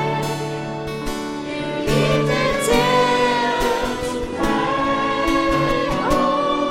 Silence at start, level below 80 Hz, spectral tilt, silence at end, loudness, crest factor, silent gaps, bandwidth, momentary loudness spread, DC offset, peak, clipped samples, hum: 0 s; -36 dBFS; -5 dB/octave; 0 s; -20 LUFS; 16 dB; none; 16.5 kHz; 10 LU; under 0.1%; -4 dBFS; under 0.1%; none